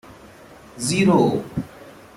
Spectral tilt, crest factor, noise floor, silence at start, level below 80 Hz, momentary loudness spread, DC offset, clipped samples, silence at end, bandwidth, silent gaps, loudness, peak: -5.5 dB/octave; 18 dB; -45 dBFS; 0.1 s; -52 dBFS; 15 LU; under 0.1%; under 0.1%; 0.25 s; 15 kHz; none; -20 LUFS; -4 dBFS